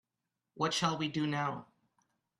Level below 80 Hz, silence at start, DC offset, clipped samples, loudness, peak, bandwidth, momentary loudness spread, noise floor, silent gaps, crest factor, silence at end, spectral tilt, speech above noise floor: -74 dBFS; 0.55 s; under 0.1%; under 0.1%; -34 LUFS; -14 dBFS; 13 kHz; 6 LU; -88 dBFS; none; 22 dB; 0.75 s; -4.5 dB/octave; 54 dB